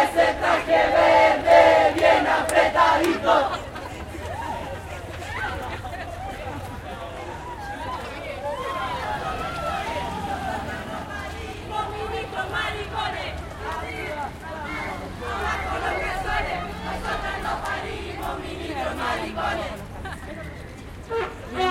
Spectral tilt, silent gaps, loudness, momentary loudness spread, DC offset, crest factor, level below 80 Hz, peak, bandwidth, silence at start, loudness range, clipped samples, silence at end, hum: -4.5 dB/octave; none; -24 LUFS; 17 LU; under 0.1%; 22 dB; -42 dBFS; -4 dBFS; 16.5 kHz; 0 s; 14 LU; under 0.1%; 0 s; none